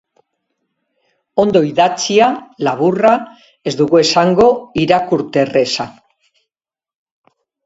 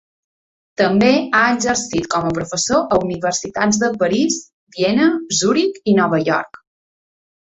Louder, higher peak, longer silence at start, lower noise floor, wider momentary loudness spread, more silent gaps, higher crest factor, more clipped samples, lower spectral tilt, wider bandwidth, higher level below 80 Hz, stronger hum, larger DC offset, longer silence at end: first, -14 LUFS vs -17 LUFS; about the same, 0 dBFS vs 0 dBFS; first, 1.35 s vs 0.8 s; about the same, under -90 dBFS vs under -90 dBFS; first, 10 LU vs 7 LU; second, none vs 4.53-4.67 s; about the same, 16 dB vs 18 dB; neither; about the same, -5 dB/octave vs -4 dB/octave; about the same, 8 kHz vs 8.4 kHz; about the same, -52 dBFS vs -50 dBFS; neither; neither; first, 1.75 s vs 1 s